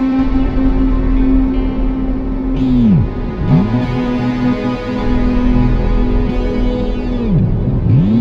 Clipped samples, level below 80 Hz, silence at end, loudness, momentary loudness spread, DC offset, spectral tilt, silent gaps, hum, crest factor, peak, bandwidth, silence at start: under 0.1%; -18 dBFS; 0 s; -15 LUFS; 6 LU; under 0.1%; -9.5 dB/octave; none; none; 12 dB; 0 dBFS; 6.2 kHz; 0 s